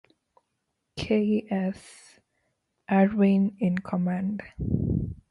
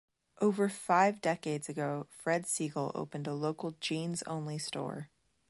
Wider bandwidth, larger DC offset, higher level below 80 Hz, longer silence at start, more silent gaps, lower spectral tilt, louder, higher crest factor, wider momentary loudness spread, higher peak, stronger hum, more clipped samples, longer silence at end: about the same, 11.5 kHz vs 12 kHz; neither; first, -46 dBFS vs -78 dBFS; first, 0.95 s vs 0.4 s; neither; first, -8.5 dB/octave vs -4.5 dB/octave; first, -26 LUFS vs -34 LUFS; about the same, 18 dB vs 20 dB; about the same, 11 LU vs 10 LU; first, -10 dBFS vs -14 dBFS; neither; neither; second, 0.15 s vs 0.45 s